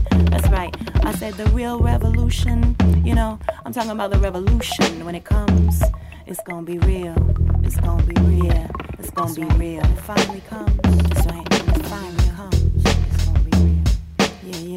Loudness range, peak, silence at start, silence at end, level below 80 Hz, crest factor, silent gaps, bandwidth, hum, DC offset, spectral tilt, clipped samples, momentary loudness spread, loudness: 1 LU; -4 dBFS; 0 s; 0 s; -20 dBFS; 14 dB; none; 16 kHz; none; under 0.1%; -6.5 dB/octave; under 0.1%; 9 LU; -20 LUFS